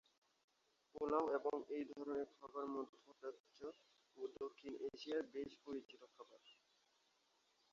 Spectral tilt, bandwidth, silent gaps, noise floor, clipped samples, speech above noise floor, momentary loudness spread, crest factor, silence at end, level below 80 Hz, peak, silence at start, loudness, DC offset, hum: -3.5 dB/octave; 7.4 kHz; 2.89-2.93 s, 3.40-3.44 s; -80 dBFS; under 0.1%; 33 dB; 20 LU; 22 dB; 1.2 s; -84 dBFS; -26 dBFS; 0.95 s; -47 LUFS; under 0.1%; none